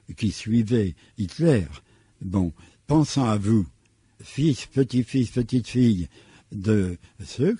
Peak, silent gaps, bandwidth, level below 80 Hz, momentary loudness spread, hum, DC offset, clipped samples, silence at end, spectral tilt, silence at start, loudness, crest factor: -8 dBFS; none; 11 kHz; -44 dBFS; 14 LU; none; under 0.1%; under 0.1%; 0 s; -7 dB/octave; 0.1 s; -24 LUFS; 16 dB